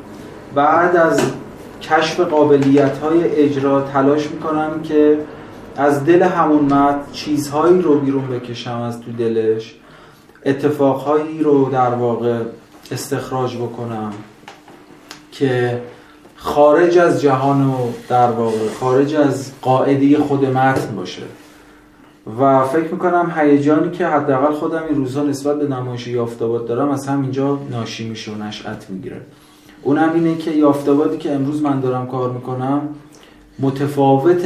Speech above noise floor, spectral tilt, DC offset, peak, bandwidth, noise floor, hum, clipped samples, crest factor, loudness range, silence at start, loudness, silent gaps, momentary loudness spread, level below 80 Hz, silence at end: 30 dB; -7 dB/octave; under 0.1%; 0 dBFS; 14.5 kHz; -46 dBFS; none; under 0.1%; 16 dB; 6 LU; 0 s; -16 LUFS; none; 14 LU; -54 dBFS; 0 s